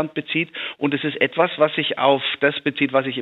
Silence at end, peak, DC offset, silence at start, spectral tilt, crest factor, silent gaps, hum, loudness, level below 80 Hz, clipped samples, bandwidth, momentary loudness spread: 0 s; -2 dBFS; under 0.1%; 0 s; -7.5 dB/octave; 18 dB; none; none; -20 LUFS; -72 dBFS; under 0.1%; 4.2 kHz; 5 LU